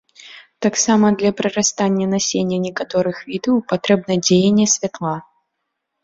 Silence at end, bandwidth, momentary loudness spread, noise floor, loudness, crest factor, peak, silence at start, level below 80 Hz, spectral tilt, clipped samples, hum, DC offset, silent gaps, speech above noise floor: 0.8 s; 7.8 kHz; 9 LU; -76 dBFS; -17 LUFS; 16 dB; -2 dBFS; 0.25 s; -56 dBFS; -4 dB/octave; under 0.1%; none; under 0.1%; none; 59 dB